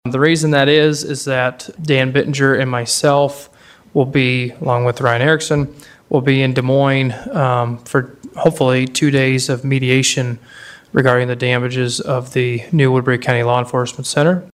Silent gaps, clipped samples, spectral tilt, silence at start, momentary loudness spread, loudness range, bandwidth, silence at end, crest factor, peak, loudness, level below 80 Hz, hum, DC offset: none; under 0.1%; -5 dB/octave; 0.05 s; 7 LU; 1 LU; 14.5 kHz; 0.05 s; 16 dB; 0 dBFS; -15 LUFS; -52 dBFS; none; under 0.1%